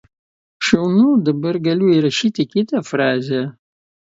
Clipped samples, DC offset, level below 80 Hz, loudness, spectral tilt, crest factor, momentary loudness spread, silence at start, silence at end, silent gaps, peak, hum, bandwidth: under 0.1%; under 0.1%; -56 dBFS; -17 LUFS; -6 dB/octave; 18 dB; 8 LU; 0.6 s; 0.65 s; none; 0 dBFS; none; 7.8 kHz